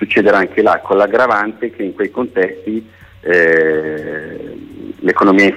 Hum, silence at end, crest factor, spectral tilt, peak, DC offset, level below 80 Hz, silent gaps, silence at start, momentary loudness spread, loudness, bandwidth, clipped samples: none; 0 s; 12 dB; -6 dB/octave; -2 dBFS; under 0.1%; -52 dBFS; none; 0 s; 15 LU; -14 LUFS; 9.6 kHz; under 0.1%